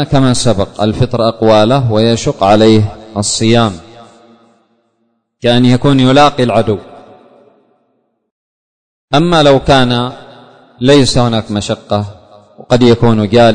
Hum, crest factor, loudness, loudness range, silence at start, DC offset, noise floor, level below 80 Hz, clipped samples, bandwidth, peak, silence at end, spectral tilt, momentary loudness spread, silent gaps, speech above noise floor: none; 12 dB; -10 LUFS; 4 LU; 0 s; under 0.1%; -62 dBFS; -34 dBFS; 0.1%; 9.6 kHz; 0 dBFS; 0 s; -5.5 dB/octave; 9 LU; 8.31-9.08 s; 53 dB